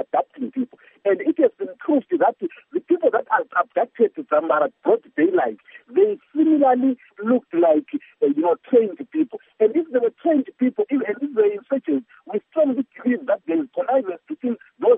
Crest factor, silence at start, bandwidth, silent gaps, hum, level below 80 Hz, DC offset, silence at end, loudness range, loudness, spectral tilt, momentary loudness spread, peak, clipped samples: 16 dB; 0 s; 3.7 kHz; none; none; -84 dBFS; under 0.1%; 0 s; 3 LU; -21 LUFS; -5 dB/octave; 9 LU; -4 dBFS; under 0.1%